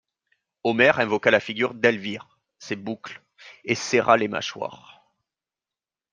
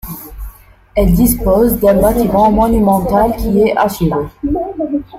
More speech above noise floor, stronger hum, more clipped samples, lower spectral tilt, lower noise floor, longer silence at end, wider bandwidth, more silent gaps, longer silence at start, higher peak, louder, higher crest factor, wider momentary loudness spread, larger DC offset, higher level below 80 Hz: first, over 67 dB vs 24 dB; neither; neither; second, -4 dB/octave vs -7 dB/octave; first, under -90 dBFS vs -36 dBFS; first, 1.35 s vs 0 s; second, 9.8 kHz vs 16 kHz; neither; first, 0.65 s vs 0.05 s; about the same, -2 dBFS vs 0 dBFS; second, -22 LUFS vs -13 LUFS; first, 22 dB vs 12 dB; first, 17 LU vs 9 LU; neither; second, -68 dBFS vs -24 dBFS